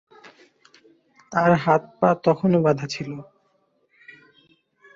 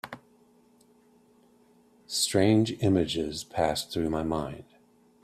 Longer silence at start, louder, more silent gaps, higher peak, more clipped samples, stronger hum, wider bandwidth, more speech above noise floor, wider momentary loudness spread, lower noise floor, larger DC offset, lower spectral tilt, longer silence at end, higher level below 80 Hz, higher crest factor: first, 0.25 s vs 0.05 s; first, -21 LUFS vs -27 LUFS; neither; first, -4 dBFS vs -10 dBFS; neither; neither; second, 7.6 kHz vs 15.5 kHz; first, 46 dB vs 35 dB; second, 12 LU vs 17 LU; first, -67 dBFS vs -61 dBFS; neither; first, -7 dB/octave vs -5 dB/octave; first, 1.75 s vs 0.6 s; second, -64 dBFS vs -54 dBFS; about the same, 20 dB vs 20 dB